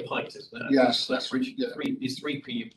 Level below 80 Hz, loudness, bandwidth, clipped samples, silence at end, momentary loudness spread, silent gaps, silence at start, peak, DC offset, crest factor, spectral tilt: -72 dBFS; -28 LUFS; 12.5 kHz; under 0.1%; 0.05 s; 11 LU; none; 0 s; -10 dBFS; under 0.1%; 18 dB; -4.5 dB/octave